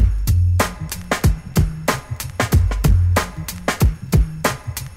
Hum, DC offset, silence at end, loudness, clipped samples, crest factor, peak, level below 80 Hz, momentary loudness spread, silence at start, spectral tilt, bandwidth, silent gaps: none; under 0.1%; 0 s; -20 LUFS; under 0.1%; 16 dB; -2 dBFS; -22 dBFS; 8 LU; 0 s; -5.5 dB/octave; 16.5 kHz; none